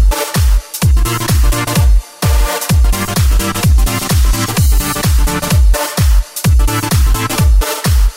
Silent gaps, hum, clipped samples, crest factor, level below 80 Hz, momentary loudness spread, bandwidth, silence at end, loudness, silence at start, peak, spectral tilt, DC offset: none; none; under 0.1%; 8 dB; -12 dBFS; 2 LU; 16.5 kHz; 0 s; -13 LUFS; 0 s; -2 dBFS; -4.5 dB/octave; under 0.1%